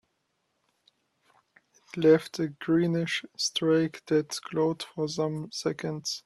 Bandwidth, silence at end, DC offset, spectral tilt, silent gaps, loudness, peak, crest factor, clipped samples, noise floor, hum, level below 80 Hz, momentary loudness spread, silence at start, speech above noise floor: 13 kHz; 0.05 s; under 0.1%; -5 dB/octave; none; -28 LUFS; -10 dBFS; 20 dB; under 0.1%; -77 dBFS; none; -70 dBFS; 10 LU; 1.95 s; 49 dB